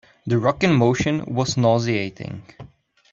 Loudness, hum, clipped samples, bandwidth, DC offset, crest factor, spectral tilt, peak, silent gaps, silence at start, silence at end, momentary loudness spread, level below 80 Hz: -20 LUFS; none; under 0.1%; 7.6 kHz; under 0.1%; 18 dB; -6 dB/octave; -4 dBFS; none; 0.25 s; 0.45 s; 16 LU; -50 dBFS